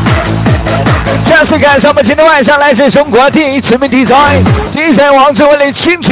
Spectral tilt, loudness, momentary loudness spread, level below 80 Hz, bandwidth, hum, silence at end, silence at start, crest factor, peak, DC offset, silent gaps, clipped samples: -10 dB/octave; -6 LUFS; 5 LU; -24 dBFS; 4 kHz; none; 0 s; 0 s; 6 dB; 0 dBFS; under 0.1%; none; 0.2%